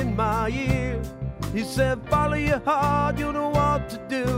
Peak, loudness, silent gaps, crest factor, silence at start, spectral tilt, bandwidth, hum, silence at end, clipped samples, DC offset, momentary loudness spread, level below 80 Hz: -8 dBFS; -24 LUFS; none; 16 dB; 0 s; -6.5 dB/octave; 16 kHz; none; 0 s; under 0.1%; under 0.1%; 7 LU; -36 dBFS